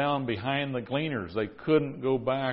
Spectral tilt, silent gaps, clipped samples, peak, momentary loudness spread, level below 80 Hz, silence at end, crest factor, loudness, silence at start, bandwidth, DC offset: -10.5 dB/octave; none; under 0.1%; -12 dBFS; 5 LU; -58 dBFS; 0 s; 16 dB; -29 LUFS; 0 s; 5.6 kHz; under 0.1%